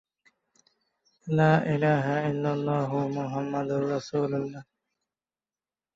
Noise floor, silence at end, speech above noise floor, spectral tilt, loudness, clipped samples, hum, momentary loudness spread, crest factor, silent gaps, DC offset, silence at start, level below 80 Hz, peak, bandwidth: under -90 dBFS; 1.35 s; over 64 dB; -8 dB/octave; -27 LUFS; under 0.1%; none; 9 LU; 18 dB; none; under 0.1%; 1.25 s; -66 dBFS; -10 dBFS; 7.6 kHz